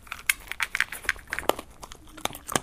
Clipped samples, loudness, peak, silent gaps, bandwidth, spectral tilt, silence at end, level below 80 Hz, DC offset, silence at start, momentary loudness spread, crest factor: under 0.1%; -29 LUFS; -2 dBFS; none; 16 kHz; -1.5 dB/octave; 0 s; -50 dBFS; under 0.1%; 0 s; 17 LU; 30 dB